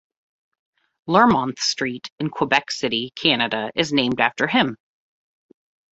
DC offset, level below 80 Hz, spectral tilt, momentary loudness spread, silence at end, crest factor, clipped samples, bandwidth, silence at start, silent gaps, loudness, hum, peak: under 0.1%; -58 dBFS; -4 dB/octave; 9 LU; 1.2 s; 22 dB; under 0.1%; 8 kHz; 1.05 s; 2.12-2.18 s; -20 LUFS; none; -2 dBFS